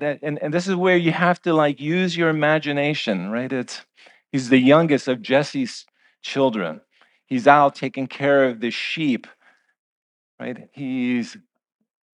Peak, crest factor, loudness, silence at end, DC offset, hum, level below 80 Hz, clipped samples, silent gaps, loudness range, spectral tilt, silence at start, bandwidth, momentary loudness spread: 0 dBFS; 22 dB; -20 LUFS; 0.8 s; under 0.1%; none; -76 dBFS; under 0.1%; 9.79-10.38 s; 4 LU; -6 dB/octave; 0 s; 10 kHz; 17 LU